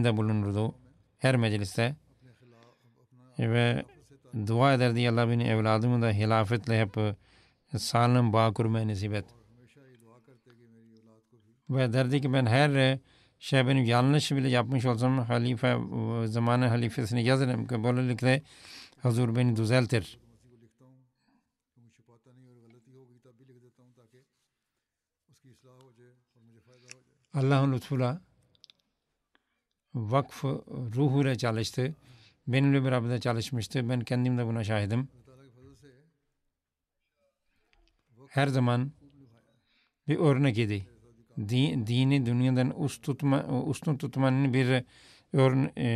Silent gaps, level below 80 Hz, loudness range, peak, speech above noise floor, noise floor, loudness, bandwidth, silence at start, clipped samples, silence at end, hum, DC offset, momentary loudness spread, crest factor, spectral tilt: none; -68 dBFS; 7 LU; -12 dBFS; 60 dB; -87 dBFS; -28 LUFS; 13 kHz; 0 s; under 0.1%; 0 s; none; under 0.1%; 11 LU; 18 dB; -7 dB/octave